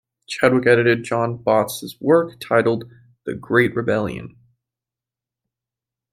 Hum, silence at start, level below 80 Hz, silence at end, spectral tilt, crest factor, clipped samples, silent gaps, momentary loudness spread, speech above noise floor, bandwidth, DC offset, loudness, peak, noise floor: none; 0.3 s; -58 dBFS; 1.85 s; -6 dB/octave; 20 dB; under 0.1%; none; 16 LU; 69 dB; 16 kHz; under 0.1%; -19 LUFS; -2 dBFS; -88 dBFS